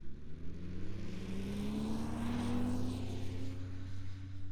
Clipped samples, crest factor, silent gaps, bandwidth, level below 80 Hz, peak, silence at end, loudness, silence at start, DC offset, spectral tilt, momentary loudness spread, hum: under 0.1%; 12 dB; none; 14 kHz; -48 dBFS; -24 dBFS; 0 s; -41 LUFS; 0 s; under 0.1%; -7 dB/octave; 11 LU; none